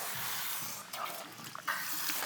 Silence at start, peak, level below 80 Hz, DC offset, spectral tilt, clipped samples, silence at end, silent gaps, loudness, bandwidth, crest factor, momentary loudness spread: 0 s; -20 dBFS; -84 dBFS; under 0.1%; -0.5 dB/octave; under 0.1%; 0 s; none; -36 LUFS; over 20 kHz; 20 dB; 8 LU